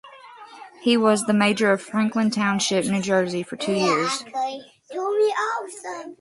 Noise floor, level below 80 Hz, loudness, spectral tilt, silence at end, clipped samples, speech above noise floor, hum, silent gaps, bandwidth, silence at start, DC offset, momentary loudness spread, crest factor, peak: -44 dBFS; -68 dBFS; -22 LUFS; -4.5 dB/octave; 0.05 s; under 0.1%; 22 dB; none; none; 11.5 kHz; 0.05 s; under 0.1%; 15 LU; 18 dB; -4 dBFS